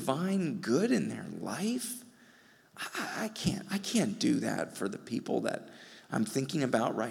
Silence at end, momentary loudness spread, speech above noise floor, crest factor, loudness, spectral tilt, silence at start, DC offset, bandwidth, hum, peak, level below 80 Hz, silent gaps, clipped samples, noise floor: 0 s; 10 LU; 28 dB; 20 dB; -33 LUFS; -5 dB/octave; 0 s; under 0.1%; 17.5 kHz; none; -12 dBFS; -68 dBFS; none; under 0.1%; -61 dBFS